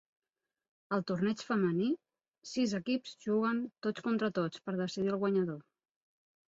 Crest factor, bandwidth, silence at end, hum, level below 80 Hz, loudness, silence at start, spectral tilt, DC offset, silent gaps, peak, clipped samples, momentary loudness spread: 16 dB; 8 kHz; 0.95 s; none; -76 dBFS; -34 LUFS; 0.9 s; -6.5 dB/octave; under 0.1%; none; -18 dBFS; under 0.1%; 6 LU